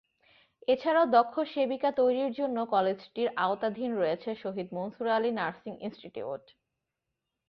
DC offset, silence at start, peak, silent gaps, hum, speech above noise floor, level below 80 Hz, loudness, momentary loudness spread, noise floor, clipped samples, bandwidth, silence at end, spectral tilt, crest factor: under 0.1%; 0.7 s; -10 dBFS; none; none; 57 dB; -74 dBFS; -30 LUFS; 14 LU; -86 dBFS; under 0.1%; 5.6 kHz; 1.1 s; -8 dB/octave; 20 dB